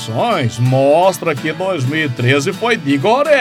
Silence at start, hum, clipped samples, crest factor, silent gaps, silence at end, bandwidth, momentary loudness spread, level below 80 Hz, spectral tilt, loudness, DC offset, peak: 0 s; none; under 0.1%; 14 dB; none; 0 s; 15.5 kHz; 7 LU; -58 dBFS; -5.5 dB/octave; -14 LUFS; under 0.1%; 0 dBFS